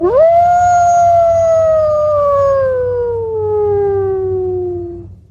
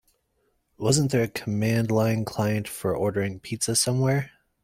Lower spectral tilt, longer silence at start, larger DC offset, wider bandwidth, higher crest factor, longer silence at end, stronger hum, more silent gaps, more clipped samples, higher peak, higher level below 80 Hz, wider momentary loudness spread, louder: first, -7 dB/octave vs -5 dB/octave; second, 0 s vs 0.8 s; neither; second, 7.2 kHz vs 16.5 kHz; second, 10 dB vs 20 dB; second, 0.15 s vs 0.35 s; neither; neither; neither; first, -2 dBFS vs -6 dBFS; first, -38 dBFS vs -56 dBFS; about the same, 9 LU vs 7 LU; first, -12 LUFS vs -25 LUFS